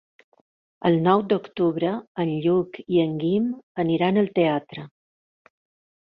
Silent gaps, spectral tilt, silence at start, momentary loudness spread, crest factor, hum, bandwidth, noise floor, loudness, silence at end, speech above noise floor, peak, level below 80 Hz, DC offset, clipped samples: 2.07-2.15 s, 3.63-3.75 s; -10 dB/octave; 0.8 s; 7 LU; 18 dB; none; 5 kHz; under -90 dBFS; -23 LUFS; 1.15 s; over 68 dB; -6 dBFS; -66 dBFS; under 0.1%; under 0.1%